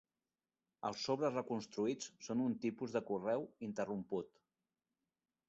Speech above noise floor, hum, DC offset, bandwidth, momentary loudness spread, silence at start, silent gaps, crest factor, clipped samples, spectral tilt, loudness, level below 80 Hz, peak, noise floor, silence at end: over 50 dB; none; under 0.1%; 8 kHz; 7 LU; 0.85 s; none; 18 dB; under 0.1%; -5 dB/octave; -41 LUFS; -82 dBFS; -24 dBFS; under -90 dBFS; 1.2 s